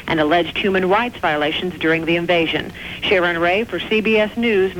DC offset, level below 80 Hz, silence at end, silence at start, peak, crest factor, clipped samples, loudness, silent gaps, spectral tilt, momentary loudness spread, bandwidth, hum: 0.2%; -46 dBFS; 0 s; 0 s; -6 dBFS; 12 dB; under 0.1%; -18 LUFS; none; -6 dB/octave; 4 LU; 19 kHz; none